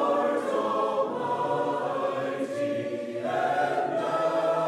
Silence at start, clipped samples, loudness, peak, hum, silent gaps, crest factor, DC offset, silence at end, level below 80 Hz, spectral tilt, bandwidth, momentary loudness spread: 0 s; under 0.1%; -28 LUFS; -14 dBFS; none; none; 12 dB; under 0.1%; 0 s; -78 dBFS; -5.5 dB/octave; 13 kHz; 5 LU